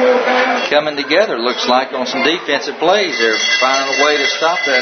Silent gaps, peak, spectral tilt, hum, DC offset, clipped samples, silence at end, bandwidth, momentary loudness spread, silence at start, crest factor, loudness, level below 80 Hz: none; 0 dBFS; -1.5 dB/octave; none; under 0.1%; under 0.1%; 0 s; 6.6 kHz; 4 LU; 0 s; 14 dB; -14 LUFS; -66 dBFS